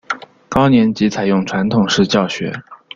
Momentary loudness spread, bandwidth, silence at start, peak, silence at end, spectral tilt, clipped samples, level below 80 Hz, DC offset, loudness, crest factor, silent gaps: 13 LU; 7.6 kHz; 0.1 s; -2 dBFS; 0.2 s; -5.5 dB/octave; under 0.1%; -46 dBFS; under 0.1%; -15 LUFS; 14 dB; none